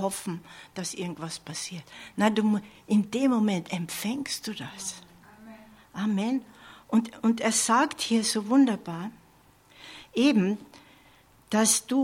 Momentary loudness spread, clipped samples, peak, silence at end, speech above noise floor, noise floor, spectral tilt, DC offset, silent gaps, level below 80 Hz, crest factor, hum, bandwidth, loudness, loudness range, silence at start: 15 LU; under 0.1%; -8 dBFS; 0 s; 32 dB; -58 dBFS; -4 dB/octave; under 0.1%; none; -68 dBFS; 18 dB; none; 16.5 kHz; -27 LUFS; 6 LU; 0 s